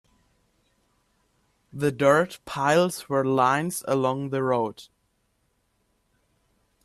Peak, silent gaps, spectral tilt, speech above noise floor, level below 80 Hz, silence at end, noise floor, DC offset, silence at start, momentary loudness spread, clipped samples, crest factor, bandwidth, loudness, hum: -8 dBFS; none; -5.5 dB/octave; 48 dB; -66 dBFS; 2 s; -71 dBFS; under 0.1%; 1.75 s; 8 LU; under 0.1%; 20 dB; 13.5 kHz; -24 LUFS; none